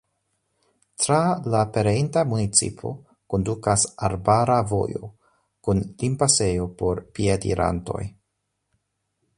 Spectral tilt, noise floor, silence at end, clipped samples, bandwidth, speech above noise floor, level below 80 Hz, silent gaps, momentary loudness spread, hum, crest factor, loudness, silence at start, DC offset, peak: -4.5 dB/octave; -77 dBFS; 1.3 s; under 0.1%; 11.5 kHz; 55 dB; -44 dBFS; none; 13 LU; none; 20 dB; -22 LUFS; 1 s; under 0.1%; -4 dBFS